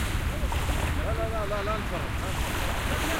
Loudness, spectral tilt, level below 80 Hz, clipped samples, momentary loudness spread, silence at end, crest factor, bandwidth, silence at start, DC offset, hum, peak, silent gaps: -29 LUFS; -4.5 dB/octave; -32 dBFS; under 0.1%; 2 LU; 0 s; 12 dB; 16 kHz; 0 s; under 0.1%; none; -14 dBFS; none